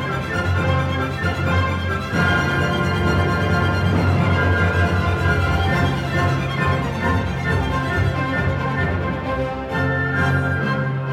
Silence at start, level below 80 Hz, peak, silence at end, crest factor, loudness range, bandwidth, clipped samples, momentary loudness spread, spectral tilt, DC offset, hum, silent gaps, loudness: 0 s; -32 dBFS; -6 dBFS; 0 s; 14 dB; 3 LU; 13.5 kHz; under 0.1%; 4 LU; -6.5 dB/octave; under 0.1%; none; none; -20 LUFS